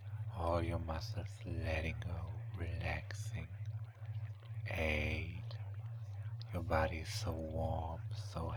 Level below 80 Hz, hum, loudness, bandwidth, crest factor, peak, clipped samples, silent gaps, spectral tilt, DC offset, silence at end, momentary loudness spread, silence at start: -50 dBFS; none; -41 LUFS; 19.5 kHz; 22 dB; -20 dBFS; under 0.1%; none; -6 dB/octave; under 0.1%; 0 s; 10 LU; 0 s